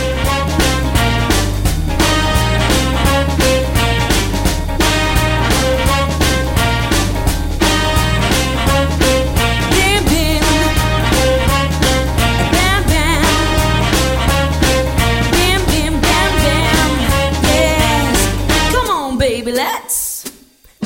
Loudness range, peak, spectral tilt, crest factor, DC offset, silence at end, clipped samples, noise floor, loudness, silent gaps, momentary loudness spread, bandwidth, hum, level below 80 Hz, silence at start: 1 LU; 0 dBFS; -4 dB/octave; 14 dB; under 0.1%; 0 s; under 0.1%; -45 dBFS; -14 LUFS; none; 4 LU; 17 kHz; none; -20 dBFS; 0 s